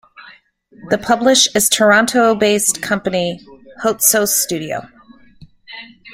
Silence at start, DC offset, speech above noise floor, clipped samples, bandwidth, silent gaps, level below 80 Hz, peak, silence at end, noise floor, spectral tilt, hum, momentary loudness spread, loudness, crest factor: 0.2 s; under 0.1%; 33 dB; under 0.1%; 16.5 kHz; none; -54 dBFS; 0 dBFS; 0 s; -48 dBFS; -2 dB/octave; none; 19 LU; -14 LUFS; 16 dB